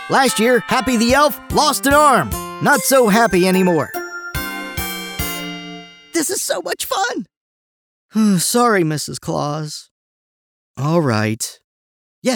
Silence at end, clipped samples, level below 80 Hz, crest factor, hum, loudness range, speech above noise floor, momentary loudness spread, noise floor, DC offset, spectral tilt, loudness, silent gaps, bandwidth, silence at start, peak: 0 s; under 0.1%; -42 dBFS; 16 dB; none; 8 LU; over 74 dB; 13 LU; under -90 dBFS; under 0.1%; -4 dB/octave; -17 LUFS; 7.37-8.09 s, 9.91-10.75 s, 11.64-12.22 s; over 20 kHz; 0 s; -2 dBFS